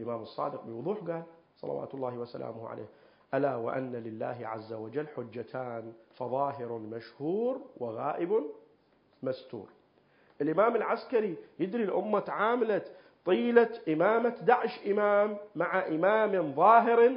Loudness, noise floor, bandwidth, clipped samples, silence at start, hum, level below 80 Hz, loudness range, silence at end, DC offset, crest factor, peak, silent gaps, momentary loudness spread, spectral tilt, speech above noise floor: -30 LUFS; -66 dBFS; 5.4 kHz; under 0.1%; 0 s; none; -80 dBFS; 9 LU; 0 s; under 0.1%; 22 dB; -8 dBFS; none; 15 LU; -10 dB/octave; 37 dB